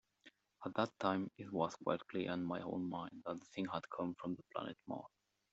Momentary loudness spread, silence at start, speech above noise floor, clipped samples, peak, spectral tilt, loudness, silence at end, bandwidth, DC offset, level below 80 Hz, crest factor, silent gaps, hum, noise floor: 9 LU; 0.25 s; 27 dB; under 0.1%; -20 dBFS; -5 dB/octave; -43 LUFS; 0.45 s; 8 kHz; under 0.1%; -80 dBFS; 22 dB; none; none; -69 dBFS